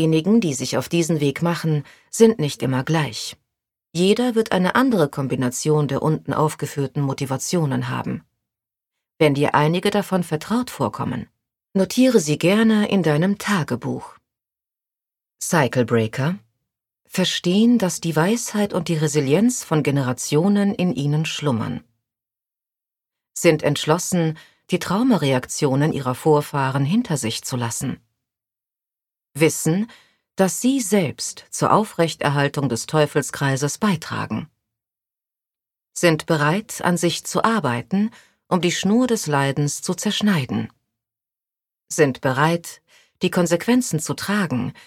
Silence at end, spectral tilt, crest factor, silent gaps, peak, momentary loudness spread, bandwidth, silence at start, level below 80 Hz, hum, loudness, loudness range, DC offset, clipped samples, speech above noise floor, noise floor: 0.15 s; -5 dB/octave; 20 dB; none; -2 dBFS; 9 LU; 16.5 kHz; 0 s; -60 dBFS; none; -20 LUFS; 4 LU; under 0.1%; under 0.1%; 70 dB; -89 dBFS